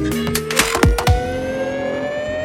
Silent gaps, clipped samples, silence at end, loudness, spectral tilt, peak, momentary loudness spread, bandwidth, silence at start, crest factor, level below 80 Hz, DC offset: none; under 0.1%; 0 s; -18 LUFS; -4.5 dB/octave; 0 dBFS; 7 LU; 17 kHz; 0 s; 18 dB; -26 dBFS; under 0.1%